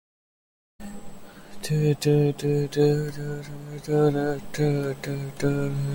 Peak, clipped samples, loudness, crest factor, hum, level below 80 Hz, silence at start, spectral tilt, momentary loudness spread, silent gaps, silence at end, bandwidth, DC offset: -10 dBFS; under 0.1%; -25 LUFS; 16 dB; none; -52 dBFS; 0.8 s; -7 dB/octave; 17 LU; none; 0 s; 17 kHz; under 0.1%